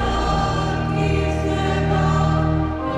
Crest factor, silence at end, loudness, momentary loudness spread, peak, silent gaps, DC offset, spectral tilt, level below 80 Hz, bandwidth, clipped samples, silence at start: 12 dB; 0 s; -20 LUFS; 3 LU; -8 dBFS; none; under 0.1%; -7 dB/octave; -28 dBFS; 10.5 kHz; under 0.1%; 0 s